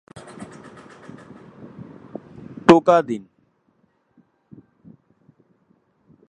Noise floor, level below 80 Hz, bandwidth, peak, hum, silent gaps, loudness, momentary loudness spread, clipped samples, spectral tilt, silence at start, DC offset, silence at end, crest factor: -64 dBFS; -60 dBFS; 10.5 kHz; 0 dBFS; none; none; -17 LUFS; 29 LU; under 0.1%; -6.5 dB/octave; 0.4 s; under 0.1%; 3.1 s; 24 dB